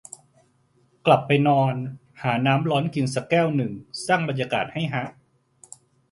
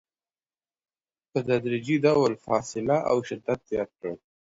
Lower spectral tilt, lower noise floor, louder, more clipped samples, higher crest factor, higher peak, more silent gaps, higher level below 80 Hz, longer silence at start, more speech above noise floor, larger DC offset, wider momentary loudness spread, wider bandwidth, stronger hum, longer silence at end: about the same, -6 dB/octave vs -6 dB/octave; second, -63 dBFS vs under -90 dBFS; first, -23 LUFS vs -26 LUFS; neither; about the same, 20 dB vs 20 dB; first, -4 dBFS vs -8 dBFS; neither; about the same, -64 dBFS vs -62 dBFS; second, 1.05 s vs 1.35 s; second, 41 dB vs over 65 dB; neither; about the same, 13 LU vs 12 LU; first, 11.5 kHz vs 7.8 kHz; neither; first, 1 s vs 0.45 s